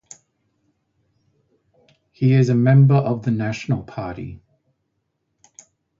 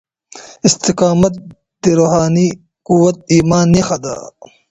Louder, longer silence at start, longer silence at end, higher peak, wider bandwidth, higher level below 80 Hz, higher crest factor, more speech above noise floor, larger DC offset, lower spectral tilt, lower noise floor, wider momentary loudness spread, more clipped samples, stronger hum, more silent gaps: second, -18 LUFS vs -13 LUFS; first, 2.2 s vs 0.35 s; first, 1.65 s vs 0.4 s; second, -4 dBFS vs 0 dBFS; about the same, 7.6 kHz vs 8.2 kHz; second, -54 dBFS vs -42 dBFS; about the same, 18 dB vs 14 dB; first, 56 dB vs 25 dB; neither; first, -8.5 dB/octave vs -5.5 dB/octave; first, -73 dBFS vs -38 dBFS; first, 17 LU vs 11 LU; neither; neither; neither